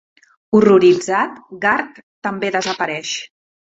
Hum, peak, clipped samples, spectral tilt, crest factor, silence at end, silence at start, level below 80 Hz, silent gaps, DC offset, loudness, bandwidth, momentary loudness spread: none; -2 dBFS; under 0.1%; -4.5 dB/octave; 16 dB; 0.5 s; 0.5 s; -58 dBFS; 2.03-2.22 s; under 0.1%; -17 LUFS; 8 kHz; 15 LU